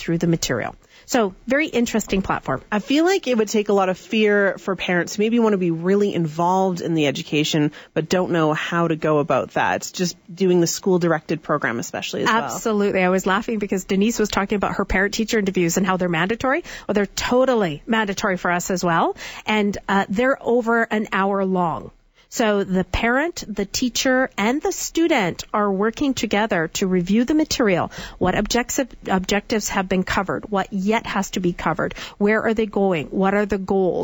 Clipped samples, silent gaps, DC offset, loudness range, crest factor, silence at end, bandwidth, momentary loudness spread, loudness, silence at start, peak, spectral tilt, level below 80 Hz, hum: under 0.1%; none; under 0.1%; 2 LU; 16 dB; 0 s; 19 kHz; 5 LU; -20 LUFS; 0 s; -4 dBFS; -4.5 dB/octave; -44 dBFS; none